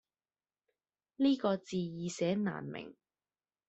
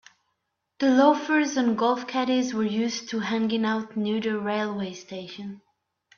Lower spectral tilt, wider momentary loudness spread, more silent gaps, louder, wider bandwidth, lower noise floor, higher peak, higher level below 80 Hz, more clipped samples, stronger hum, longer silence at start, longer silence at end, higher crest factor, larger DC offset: first, -6 dB/octave vs -4.5 dB/octave; about the same, 15 LU vs 16 LU; neither; second, -35 LUFS vs -25 LUFS; first, 8.2 kHz vs 7.2 kHz; first, under -90 dBFS vs -78 dBFS; second, -18 dBFS vs -6 dBFS; about the same, -76 dBFS vs -72 dBFS; neither; neither; first, 1.2 s vs 0.8 s; first, 0.75 s vs 0.6 s; about the same, 18 dB vs 20 dB; neither